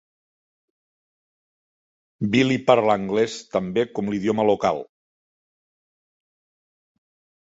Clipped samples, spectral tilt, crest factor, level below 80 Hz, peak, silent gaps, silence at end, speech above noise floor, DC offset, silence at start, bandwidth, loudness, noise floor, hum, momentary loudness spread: under 0.1%; -6 dB/octave; 22 dB; -60 dBFS; -2 dBFS; none; 2.55 s; over 69 dB; under 0.1%; 2.2 s; 8 kHz; -22 LUFS; under -90 dBFS; none; 8 LU